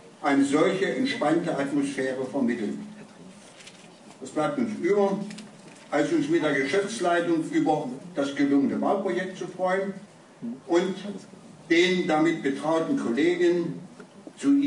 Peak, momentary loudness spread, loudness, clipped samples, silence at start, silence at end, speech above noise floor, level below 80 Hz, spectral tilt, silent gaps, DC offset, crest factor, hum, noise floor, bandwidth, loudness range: -10 dBFS; 19 LU; -25 LUFS; under 0.1%; 0.05 s; 0 s; 24 dB; -76 dBFS; -5.5 dB/octave; none; under 0.1%; 16 dB; none; -49 dBFS; 11 kHz; 5 LU